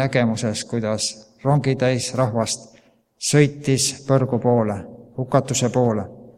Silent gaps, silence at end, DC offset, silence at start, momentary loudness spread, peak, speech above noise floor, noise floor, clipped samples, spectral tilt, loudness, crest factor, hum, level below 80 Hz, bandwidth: none; 0.05 s; under 0.1%; 0 s; 8 LU; 0 dBFS; 33 dB; -53 dBFS; under 0.1%; -5 dB/octave; -21 LUFS; 20 dB; none; -56 dBFS; 15 kHz